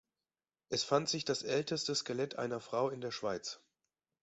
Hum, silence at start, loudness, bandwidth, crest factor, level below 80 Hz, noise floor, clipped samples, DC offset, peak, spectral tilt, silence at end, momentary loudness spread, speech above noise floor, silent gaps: none; 0.7 s; -36 LUFS; 8 kHz; 22 dB; -76 dBFS; under -90 dBFS; under 0.1%; under 0.1%; -16 dBFS; -3 dB/octave; 0.65 s; 7 LU; over 54 dB; none